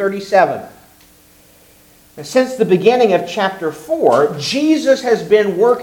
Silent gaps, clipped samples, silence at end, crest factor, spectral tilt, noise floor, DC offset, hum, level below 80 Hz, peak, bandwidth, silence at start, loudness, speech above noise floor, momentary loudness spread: none; under 0.1%; 0 s; 16 dB; -5 dB/octave; -47 dBFS; under 0.1%; none; -58 dBFS; 0 dBFS; 18 kHz; 0 s; -14 LUFS; 33 dB; 7 LU